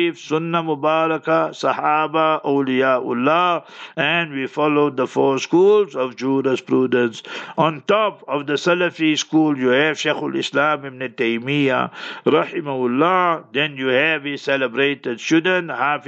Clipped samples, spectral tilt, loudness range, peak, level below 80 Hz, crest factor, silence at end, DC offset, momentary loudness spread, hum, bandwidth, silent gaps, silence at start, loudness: under 0.1%; -5 dB/octave; 1 LU; -2 dBFS; -76 dBFS; 16 dB; 0.05 s; under 0.1%; 6 LU; none; 8.2 kHz; none; 0 s; -19 LUFS